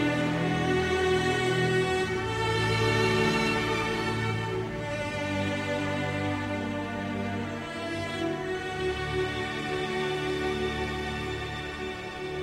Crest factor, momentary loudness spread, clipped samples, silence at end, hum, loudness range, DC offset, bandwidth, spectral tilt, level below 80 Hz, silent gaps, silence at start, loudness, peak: 16 dB; 8 LU; under 0.1%; 0 s; none; 6 LU; under 0.1%; 15.5 kHz; -5.5 dB/octave; -48 dBFS; none; 0 s; -29 LUFS; -12 dBFS